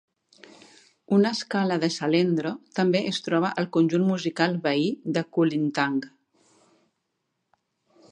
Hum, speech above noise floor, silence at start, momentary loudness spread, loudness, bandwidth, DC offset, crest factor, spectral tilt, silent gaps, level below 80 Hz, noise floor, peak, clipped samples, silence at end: none; 54 dB; 1.1 s; 5 LU; -25 LUFS; 10 kHz; under 0.1%; 22 dB; -6 dB/octave; none; -74 dBFS; -78 dBFS; -4 dBFS; under 0.1%; 2.05 s